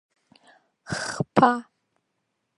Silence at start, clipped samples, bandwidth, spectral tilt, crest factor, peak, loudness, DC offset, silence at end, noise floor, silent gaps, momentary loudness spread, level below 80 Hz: 0.9 s; under 0.1%; 11.5 kHz; -5 dB/octave; 26 dB; -2 dBFS; -24 LUFS; under 0.1%; 0.95 s; -77 dBFS; none; 12 LU; -62 dBFS